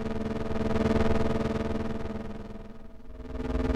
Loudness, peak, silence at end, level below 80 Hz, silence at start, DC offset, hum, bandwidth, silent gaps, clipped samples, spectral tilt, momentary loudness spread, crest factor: -30 LUFS; -14 dBFS; 0 s; -38 dBFS; 0 s; under 0.1%; none; 9.4 kHz; none; under 0.1%; -7.5 dB/octave; 19 LU; 14 dB